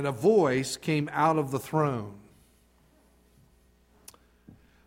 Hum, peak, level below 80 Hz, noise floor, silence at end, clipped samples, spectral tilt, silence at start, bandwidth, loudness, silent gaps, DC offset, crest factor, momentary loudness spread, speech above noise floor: 60 Hz at -65 dBFS; -12 dBFS; -64 dBFS; -63 dBFS; 2.7 s; under 0.1%; -6 dB/octave; 0 s; 16.5 kHz; -27 LUFS; none; under 0.1%; 18 dB; 7 LU; 36 dB